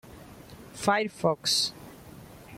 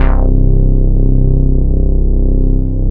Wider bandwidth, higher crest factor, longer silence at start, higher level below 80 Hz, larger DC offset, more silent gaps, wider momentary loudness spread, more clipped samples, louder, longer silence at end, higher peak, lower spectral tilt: first, 16.5 kHz vs 2.4 kHz; first, 22 dB vs 8 dB; about the same, 0.05 s vs 0 s; second, -60 dBFS vs -10 dBFS; neither; neither; first, 23 LU vs 2 LU; neither; second, -27 LUFS vs -14 LUFS; about the same, 0 s vs 0 s; second, -8 dBFS vs 0 dBFS; second, -3 dB/octave vs -13 dB/octave